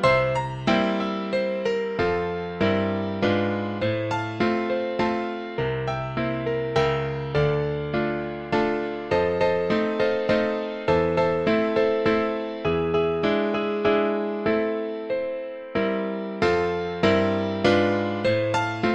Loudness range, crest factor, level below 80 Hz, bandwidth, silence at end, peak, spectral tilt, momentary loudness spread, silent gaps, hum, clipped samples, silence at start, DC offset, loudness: 3 LU; 18 dB; -48 dBFS; 9.4 kHz; 0 s; -6 dBFS; -7 dB/octave; 6 LU; none; none; under 0.1%; 0 s; under 0.1%; -24 LUFS